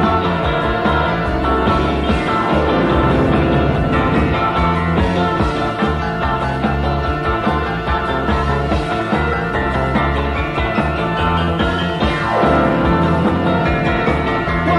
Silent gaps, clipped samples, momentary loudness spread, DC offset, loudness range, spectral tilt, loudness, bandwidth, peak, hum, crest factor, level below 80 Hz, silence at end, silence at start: none; under 0.1%; 4 LU; under 0.1%; 3 LU; -7.5 dB/octave; -16 LUFS; 11.5 kHz; -2 dBFS; none; 14 dB; -26 dBFS; 0 s; 0 s